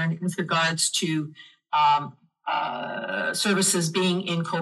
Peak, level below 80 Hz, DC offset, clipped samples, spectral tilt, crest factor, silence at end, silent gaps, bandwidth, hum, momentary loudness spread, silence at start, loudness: -8 dBFS; -80 dBFS; under 0.1%; under 0.1%; -3.5 dB/octave; 16 dB; 0 s; none; 12.5 kHz; none; 9 LU; 0 s; -24 LUFS